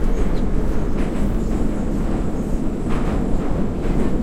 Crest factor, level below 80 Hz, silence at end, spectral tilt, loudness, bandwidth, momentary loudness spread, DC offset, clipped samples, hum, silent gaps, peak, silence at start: 12 dB; -22 dBFS; 0 s; -8 dB/octave; -23 LUFS; 10.5 kHz; 2 LU; under 0.1%; under 0.1%; none; none; -6 dBFS; 0 s